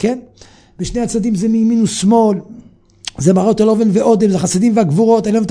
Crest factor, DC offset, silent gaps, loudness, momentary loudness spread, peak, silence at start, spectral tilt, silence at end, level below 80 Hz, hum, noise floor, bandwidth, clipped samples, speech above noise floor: 14 dB; under 0.1%; none; -13 LUFS; 11 LU; 0 dBFS; 0 s; -6.5 dB/octave; 0 s; -42 dBFS; none; -33 dBFS; 10.5 kHz; under 0.1%; 20 dB